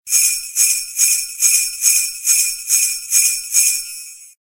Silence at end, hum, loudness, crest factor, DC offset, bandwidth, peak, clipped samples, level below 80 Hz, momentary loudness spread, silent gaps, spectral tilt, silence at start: 0.15 s; none; -13 LUFS; 18 dB; under 0.1%; 16 kHz; 0 dBFS; under 0.1%; -58 dBFS; 2 LU; none; 6.5 dB/octave; 0.05 s